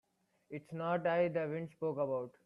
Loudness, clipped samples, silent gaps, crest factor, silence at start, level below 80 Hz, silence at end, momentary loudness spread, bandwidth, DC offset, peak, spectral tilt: -36 LUFS; under 0.1%; none; 16 dB; 0.5 s; -80 dBFS; 0.15 s; 14 LU; 5.4 kHz; under 0.1%; -20 dBFS; -8.5 dB/octave